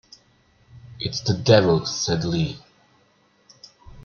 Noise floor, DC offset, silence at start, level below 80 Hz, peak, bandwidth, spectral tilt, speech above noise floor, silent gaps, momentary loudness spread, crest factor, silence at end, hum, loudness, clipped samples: -61 dBFS; under 0.1%; 0.75 s; -50 dBFS; -2 dBFS; 7 kHz; -5 dB/octave; 40 dB; none; 13 LU; 22 dB; 0.05 s; none; -21 LUFS; under 0.1%